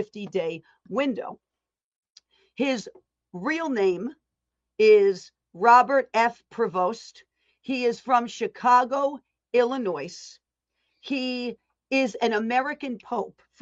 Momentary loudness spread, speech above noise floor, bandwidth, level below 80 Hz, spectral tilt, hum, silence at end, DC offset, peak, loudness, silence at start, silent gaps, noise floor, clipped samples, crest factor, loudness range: 20 LU; 60 dB; 8 kHz; -74 dBFS; -4.5 dB/octave; none; 0.3 s; under 0.1%; -6 dBFS; -24 LUFS; 0 s; 1.84-1.91 s, 1.98-2.03 s; -84 dBFS; under 0.1%; 20 dB; 8 LU